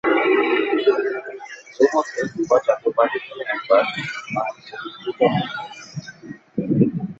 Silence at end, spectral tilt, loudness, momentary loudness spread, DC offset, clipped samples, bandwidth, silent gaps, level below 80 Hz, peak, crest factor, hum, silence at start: 0.05 s; -6 dB/octave; -21 LUFS; 16 LU; under 0.1%; under 0.1%; 8 kHz; none; -62 dBFS; -2 dBFS; 18 dB; none; 0.05 s